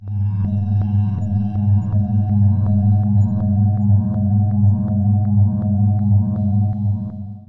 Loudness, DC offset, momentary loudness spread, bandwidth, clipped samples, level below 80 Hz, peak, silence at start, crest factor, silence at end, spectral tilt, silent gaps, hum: -17 LUFS; under 0.1%; 5 LU; 1.7 kHz; under 0.1%; -44 dBFS; -6 dBFS; 0 s; 10 dB; 0.05 s; -13 dB/octave; none; none